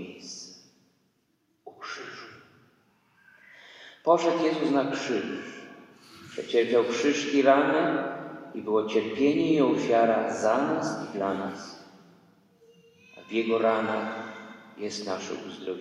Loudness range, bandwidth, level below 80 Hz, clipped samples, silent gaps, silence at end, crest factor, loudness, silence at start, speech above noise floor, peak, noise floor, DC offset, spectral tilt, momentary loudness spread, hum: 8 LU; 10.5 kHz; -78 dBFS; under 0.1%; none; 0 s; 20 dB; -26 LUFS; 0 s; 46 dB; -8 dBFS; -71 dBFS; under 0.1%; -5 dB/octave; 19 LU; none